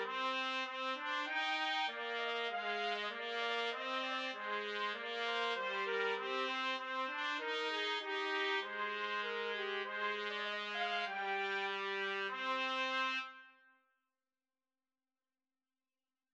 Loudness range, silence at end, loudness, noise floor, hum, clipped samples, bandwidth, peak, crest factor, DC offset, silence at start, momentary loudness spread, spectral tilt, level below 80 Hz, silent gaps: 3 LU; 2.85 s; -38 LUFS; under -90 dBFS; none; under 0.1%; 9.2 kHz; -22 dBFS; 18 dB; under 0.1%; 0 s; 4 LU; -2 dB/octave; under -90 dBFS; none